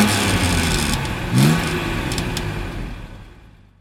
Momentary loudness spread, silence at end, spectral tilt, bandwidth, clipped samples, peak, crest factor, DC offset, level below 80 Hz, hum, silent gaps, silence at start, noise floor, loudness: 15 LU; 0.35 s; -4.5 dB/octave; 16.5 kHz; under 0.1%; -2 dBFS; 18 dB; under 0.1%; -30 dBFS; none; none; 0 s; -45 dBFS; -20 LUFS